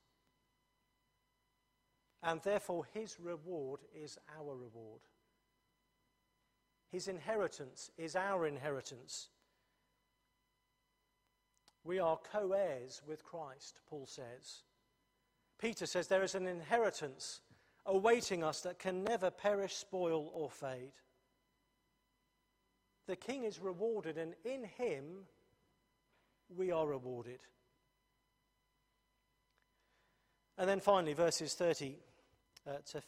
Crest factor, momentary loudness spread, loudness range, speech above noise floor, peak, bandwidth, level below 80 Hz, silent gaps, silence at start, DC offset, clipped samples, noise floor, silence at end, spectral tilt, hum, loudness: 24 dB; 18 LU; 12 LU; 43 dB; -18 dBFS; 15.5 kHz; -80 dBFS; none; 2.2 s; under 0.1%; under 0.1%; -83 dBFS; 0 s; -4 dB/octave; 50 Hz at -80 dBFS; -40 LUFS